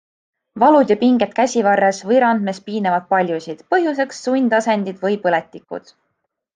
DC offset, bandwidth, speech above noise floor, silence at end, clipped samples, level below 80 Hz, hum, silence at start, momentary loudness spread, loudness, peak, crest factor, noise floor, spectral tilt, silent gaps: under 0.1%; 9.6 kHz; 57 dB; 0.75 s; under 0.1%; -68 dBFS; none; 0.55 s; 10 LU; -17 LUFS; -2 dBFS; 16 dB; -73 dBFS; -5.5 dB/octave; none